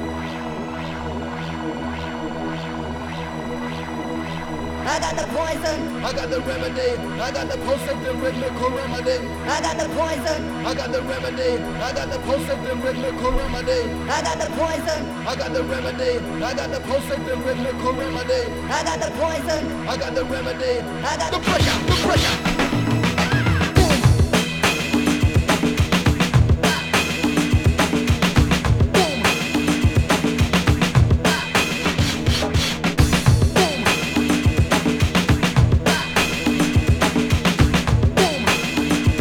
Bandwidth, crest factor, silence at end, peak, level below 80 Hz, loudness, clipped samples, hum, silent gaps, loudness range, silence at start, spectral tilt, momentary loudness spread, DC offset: 18 kHz; 18 dB; 0 s; -2 dBFS; -30 dBFS; -20 LUFS; under 0.1%; none; none; 7 LU; 0 s; -5 dB/octave; 10 LU; under 0.1%